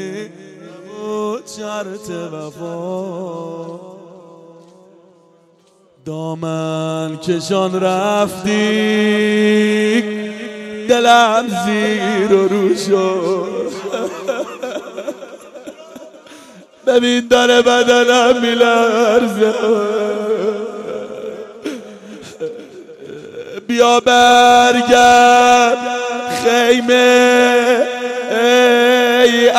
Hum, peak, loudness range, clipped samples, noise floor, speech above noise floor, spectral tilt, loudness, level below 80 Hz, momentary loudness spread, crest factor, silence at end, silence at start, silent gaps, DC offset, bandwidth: none; 0 dBFS; 16 LU; under 0.1%; -52 dBFS; 39 dB; -3.5 dB/octave; -13 LUFS; -56 dBFS; 19 LU; 14 dB; 0 s; 0 s; none; under 0.1%; 14.5 kHz